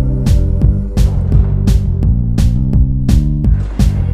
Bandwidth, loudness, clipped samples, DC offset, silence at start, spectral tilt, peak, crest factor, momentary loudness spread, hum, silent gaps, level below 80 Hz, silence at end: 11.5 kHz; -14 LUFS; under 0.1%; under 0.1%; 0 s; -8 dB/octave; 0 dBFS; 10 dB; 2 LU; none; none; -14 dBFS; 0 s